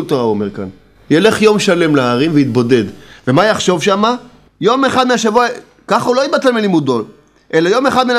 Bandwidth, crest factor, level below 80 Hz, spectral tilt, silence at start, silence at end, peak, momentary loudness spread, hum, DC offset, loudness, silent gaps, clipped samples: 15 kHz; 12 dB; -52 dBFS; -5 dB/octave; 0 s; 0 s; 0 dBFS; 10 LU; none; under 0.1%; -13 LUFS; none; 0.1%